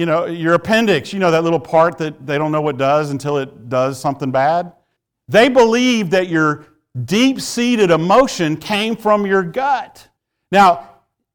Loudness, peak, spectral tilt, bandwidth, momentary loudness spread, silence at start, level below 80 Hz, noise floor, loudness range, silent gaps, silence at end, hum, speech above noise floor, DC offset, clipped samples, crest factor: -15 LUFS; -2 dBFS; -5 dB/octave; 19 kHz; 10 LU; 0 s; -52 dBFS; -68 dBFS; 3 LU; none; 0.5 s; none; 53 dB; under 0.1%; under 0.1%; 14 dB